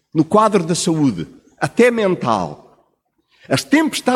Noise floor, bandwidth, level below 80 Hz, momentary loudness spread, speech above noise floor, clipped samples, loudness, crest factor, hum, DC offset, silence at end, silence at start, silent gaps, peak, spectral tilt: -65 dBFS; 16 kHz; -56 dBFS; 11 LU; 49 dB; under 0.1%; -16 LUFS; 16 dB; none; under 0.1%; 0 s; 0.15 s; none; -2 dBFS; -5 dB/octave